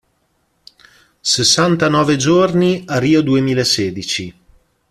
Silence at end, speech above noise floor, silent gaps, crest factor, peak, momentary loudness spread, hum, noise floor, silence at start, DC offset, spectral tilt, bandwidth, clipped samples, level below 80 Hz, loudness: 0.6 s; 49 dB; none; 16 dB; 0 dBFS; 10 LU; none; -63 dBFS; 1.25 s; under 0.1%; -4 dB/octave; 14 kHz; under 0.1%; -50 dBFS; -14 LUFS